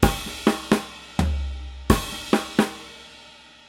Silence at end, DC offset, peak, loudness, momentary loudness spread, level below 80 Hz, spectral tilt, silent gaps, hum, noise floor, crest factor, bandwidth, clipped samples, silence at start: 0.3 s; under 0.1%; 0 dBFS; -24 LUFS; 19 LU; -32 dBFS; -5 dB/octave; none; none; -48 dBFS; 24 dB; 16.5 kHz; under 0.1%; 0 s